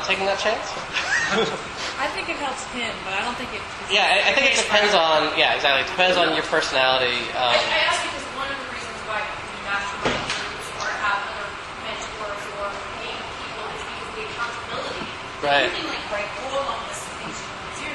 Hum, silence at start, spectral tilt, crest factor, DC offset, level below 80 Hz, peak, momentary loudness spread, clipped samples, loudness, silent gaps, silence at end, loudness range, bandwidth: none; 0 s; -2 dB/octave; 22 dB; under 0.1%; -50 dBFS; -2 dBFS; 13 LU; under 0.1%; -22 LUFS; none; 0 s; 10 LU; 11.5 kHz